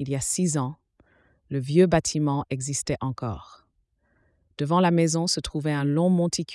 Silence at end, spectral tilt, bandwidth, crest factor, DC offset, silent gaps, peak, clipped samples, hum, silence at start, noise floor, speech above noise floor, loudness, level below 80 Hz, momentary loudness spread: 0 s; -5 dB/octave; 12 kHz; 18 dB; under 0.1%; none; -6 dBFS; under 0.1%; none; 0 s; -69 dBFS; 46 dB; -24 LUFS; -52 dBFS; 12 LU